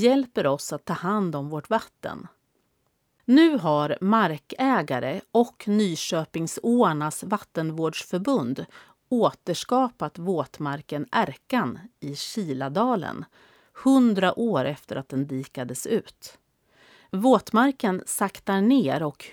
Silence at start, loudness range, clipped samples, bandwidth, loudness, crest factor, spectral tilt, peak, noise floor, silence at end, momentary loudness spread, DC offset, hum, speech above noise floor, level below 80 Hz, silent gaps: 0 s; 5 LU; under 0.1%; 18 kHz; -25 LUFS; 20 dB; -5.5 dB/octave; -6 dBFS; -72 dBFS; 0 s; 12 LU; under 0.1%; none; 47 dB; -68 dBFS; none